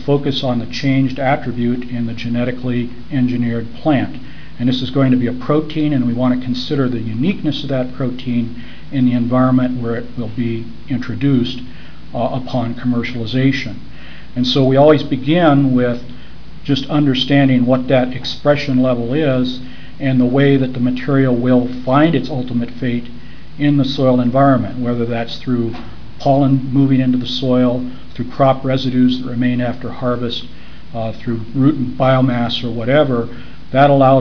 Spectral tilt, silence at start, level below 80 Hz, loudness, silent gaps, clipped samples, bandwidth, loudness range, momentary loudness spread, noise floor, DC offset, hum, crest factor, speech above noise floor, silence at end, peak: -8 dB/octave; 0 s; -42 dBFS; -16 LUFS; none; under 0.1%; 5.4 kHz; 4 LU; 12 LU; -36 dBFS; 5%; none; 16 dB; 21 dB; 0 s; 0 dBFS